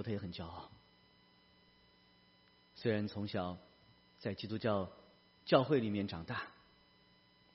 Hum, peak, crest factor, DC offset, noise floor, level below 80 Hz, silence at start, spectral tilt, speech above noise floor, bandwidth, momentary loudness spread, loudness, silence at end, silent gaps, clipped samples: none; -14 dBFS; 26 dB; under 0.1%; -68 dBFS; -70 dBFS; 0 s; -5 dB/octave; 31 dB; 5.8 kHz; 19 LU; -38 LUFS; 1 s; none; under 0.1%